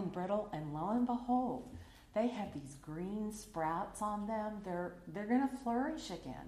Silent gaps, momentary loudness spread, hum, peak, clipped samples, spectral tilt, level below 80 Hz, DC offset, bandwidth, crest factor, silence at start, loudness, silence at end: none; 10 LU; none; -22 dBFS; under 0.1%; -6.5 dB/octave; -62 dBFS; under 0.1%; 14.5 kHz; 16 dB; 0 s; -39 LUFS; 0 s